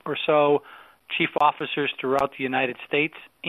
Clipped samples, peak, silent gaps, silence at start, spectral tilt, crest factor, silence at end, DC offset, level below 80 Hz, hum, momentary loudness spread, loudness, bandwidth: under 0.1%; -6 dBFS; none; 0.05 s; -6 dB/octave; 18 dB; 0 s; under 0.1%; -66 dBFS; none; 6 LU; -24 LUFS; 13.5 kHz